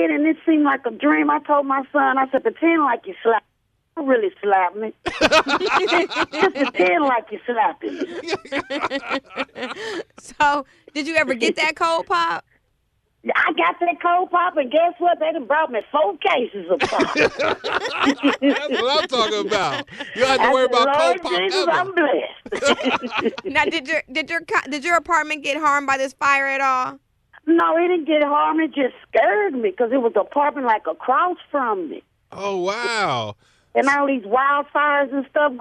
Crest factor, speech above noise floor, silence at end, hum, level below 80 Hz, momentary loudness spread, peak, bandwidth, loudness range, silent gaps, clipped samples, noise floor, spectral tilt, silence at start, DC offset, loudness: 16 dB; 48 dB; 0 s; none; -58 dBFS; 9 LU; -4 dBFS; 12.5 kHz; 3 LU; none; under 0.1%; -67 dBFS; -3.5 dB/octave; 0 s; under 0.1%; -20 LUFS